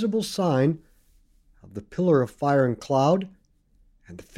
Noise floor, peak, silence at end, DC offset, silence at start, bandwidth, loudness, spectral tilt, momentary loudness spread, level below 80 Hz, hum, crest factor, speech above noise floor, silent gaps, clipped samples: -61 dBFS; -8 dBFS; 0.15 s; under 0.1%; 0 s; 15 kHz; -23 LUFS; -7 dB/octave; 16 LU; -58 dBFS; none; 16 dB; 38 dB; none; under 0.1%